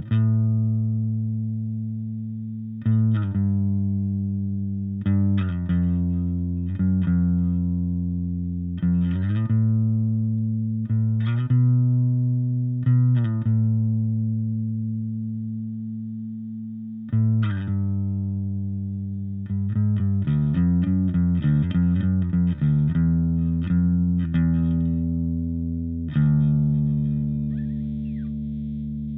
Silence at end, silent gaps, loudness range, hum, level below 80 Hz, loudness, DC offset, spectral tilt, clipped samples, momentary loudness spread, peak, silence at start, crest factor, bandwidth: 0 s; none; 5 LU; none; -40 dBFS; -23 LUFS; under 0.1%; -13 dB/octave; under 0.1%; 9 LU; -10 dBFS; 0 s; 12 dB; 3.9 kHz